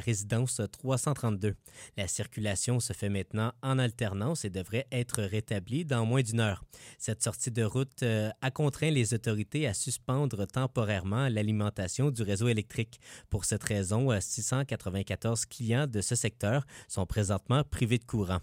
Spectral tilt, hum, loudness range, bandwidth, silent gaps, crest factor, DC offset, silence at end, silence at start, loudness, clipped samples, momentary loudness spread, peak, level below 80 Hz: -5 dB/octave; none; 2 LU; 16 kHz; none; 22 dB; under 0.1%; 0 s; 0 s; -31 LUFS; under 0.1%; 6 LU; -8 dBFS; -54 dBFS